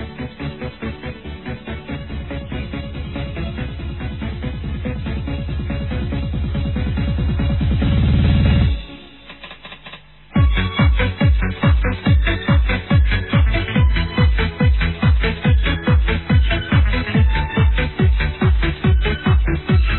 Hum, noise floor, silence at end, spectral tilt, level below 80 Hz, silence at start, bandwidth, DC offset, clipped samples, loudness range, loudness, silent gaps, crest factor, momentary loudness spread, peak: none; -40 dBFS; 0 s; -10.5 dB/octave; -20 dBFS; 0 s; 4.3 kHz; 0.4%; under 0.1%; 10 LU; -19 LUFS; none; 14 dB; 12 LU; -4 dBFS